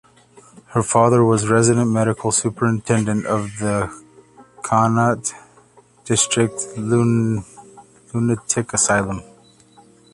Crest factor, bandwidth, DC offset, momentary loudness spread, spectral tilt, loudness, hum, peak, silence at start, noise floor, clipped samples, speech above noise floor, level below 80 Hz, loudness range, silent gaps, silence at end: 18 dB; 11.5 kHz; under 0.1%; 10 LU; -5 dB/octave; -18 LUFS; 60 Hz at -45 dBFS; -2 dBFS; 0.7 s; -51 dBFS; under 0.1%; 33 dB; -50 dBFS; 4 LU; none; 0.9 s